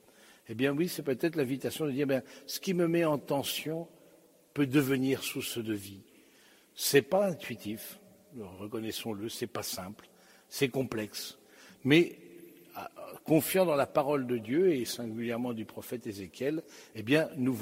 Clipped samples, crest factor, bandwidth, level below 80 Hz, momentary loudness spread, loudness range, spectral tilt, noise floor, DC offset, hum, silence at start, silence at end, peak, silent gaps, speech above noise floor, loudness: under 0.1%; 24 dB; 16 kHz; -72 dBFS; 18 LU; 6 LU; -5 dB/octave; -61 dBFS; under 0.1%; none; 0.5 s; 0 s; -8 dBFS; none; 30 dB; -31 LUFS